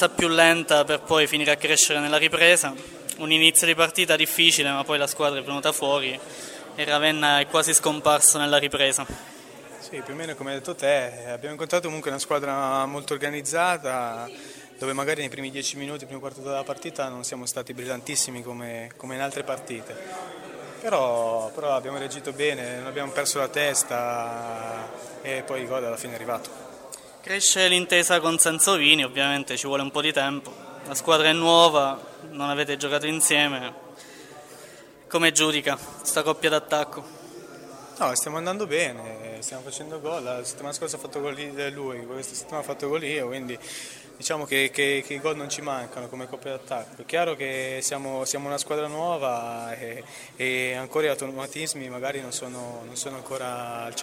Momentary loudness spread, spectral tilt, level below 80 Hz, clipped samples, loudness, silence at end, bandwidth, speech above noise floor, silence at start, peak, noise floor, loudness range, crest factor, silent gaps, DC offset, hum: 19 LU; -1.5 dB/octave; -64 dBFS; under 0.1%; -23 LUFS; 0 s; 16 kHz; 22 dB; 0 s; 0 dBFS; -47 dBFS; 11 LU; 24 dB; none; under 0.1%; none